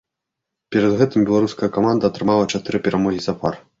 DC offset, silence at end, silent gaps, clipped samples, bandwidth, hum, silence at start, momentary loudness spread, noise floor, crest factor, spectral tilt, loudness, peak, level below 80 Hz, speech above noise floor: under 0.1%; 0.2 s; none; under 0.1%; 7.8 kHz; none; 0.7 s; 7 LU; -82 dBFS; 16 dB; -6.5 dB/octave; -19 LUFS; -2 dBFS; -52 dBFS; 64 dB